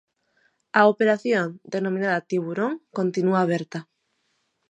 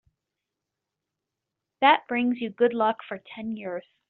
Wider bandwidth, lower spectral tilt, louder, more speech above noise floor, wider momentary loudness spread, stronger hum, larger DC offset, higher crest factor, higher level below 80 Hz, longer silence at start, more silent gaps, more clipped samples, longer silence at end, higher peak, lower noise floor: first, 9.2 kHz vs 4.4 kHz; first, -6.5 dB/octave vs -1.5 dB/octave; about the same, -23 LUFS vs -24 LUFS; second, 50 dB vs 60 dB; second, 10 LU vs 15 LU; neither; neither; about the same, 22 dB vs 22 dB; about the same, -76 dBFS vs -74 dBFS; second, 0.75 s vs 1.8 s; neither; neither; first, 0.9 s vs 0.3 s; about the same, -4 dBFS vs -4 dBFS; second, -72 dBFS vs -86 dBFS